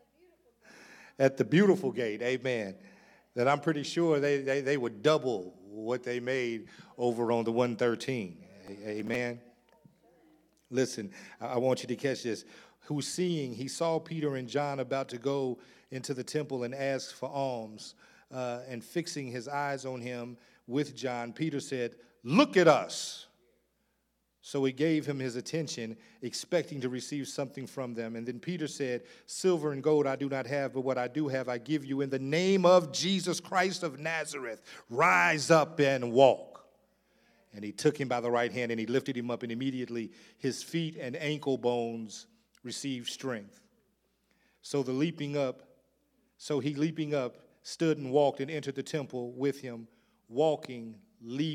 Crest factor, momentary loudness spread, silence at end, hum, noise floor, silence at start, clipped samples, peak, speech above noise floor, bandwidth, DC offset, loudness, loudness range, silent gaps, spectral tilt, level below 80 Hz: 24 dB; 16 LU; 0 s; none; -77 dBFS; 0.75 s; under 0.1%; -6 dBFS; 46 dB; 15.5 kHz; under 0.1%; -31 LUFS; 9 LU; none; -5 dB/octave; -80 dBFS